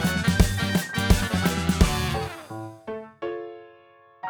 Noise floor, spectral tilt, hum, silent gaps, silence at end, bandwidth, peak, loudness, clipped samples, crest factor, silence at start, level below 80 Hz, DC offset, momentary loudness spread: -54 dBFS; -5 dB/octave; none; none; 0 s; over 20 kHz; -4 dBFS; -24 LUFS; under 0.1%; 20 dB; 0 s; -30 dBFS; under 0.1%; 15 LU